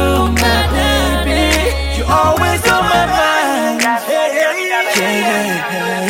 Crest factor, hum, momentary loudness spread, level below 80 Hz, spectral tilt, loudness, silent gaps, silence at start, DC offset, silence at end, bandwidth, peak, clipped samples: 14 dB; none; 3 LU; -24 dBFS; -4 dB/octave; -13 LUFS; none; 0 s; under 0.1%; 0 s; 16.5 kHz; 0 dBFS; under 0.1%